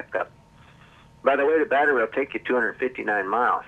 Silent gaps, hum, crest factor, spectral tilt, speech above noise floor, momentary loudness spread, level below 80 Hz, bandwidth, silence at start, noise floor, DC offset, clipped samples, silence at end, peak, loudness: none; none; 18 dB; -6 dB/octave; 29 dB; 9 LU; -62 dBFS; 8.6 kHz; 0 s; -52 dBFS; under 0.1%; under 0.1%; 0 s; -6 dBFS; -23 LUFS